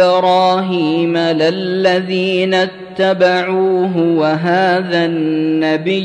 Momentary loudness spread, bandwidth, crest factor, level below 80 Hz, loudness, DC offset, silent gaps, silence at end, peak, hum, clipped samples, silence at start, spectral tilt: 4 LU; 9.6 kHz; 12 dB; -60 dBFS; -14 LUFS; under 0.1%; none; 0 s; -2 dBFS; none; under 0.1%; 0 s; -6.5 dB/octave